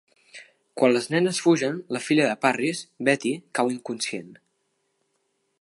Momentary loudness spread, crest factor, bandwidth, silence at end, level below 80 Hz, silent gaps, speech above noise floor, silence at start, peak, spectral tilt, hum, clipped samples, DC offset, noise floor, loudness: 9 LU; 22 dB; 11.5 kHz; 1.25 s; -78 dBFS; none; 50 dB; 0.35 s; -4 dBFS; -4.5 dB/octave; none; under 0.1%; under 0.1%; -73 dBFS; -24 LUFS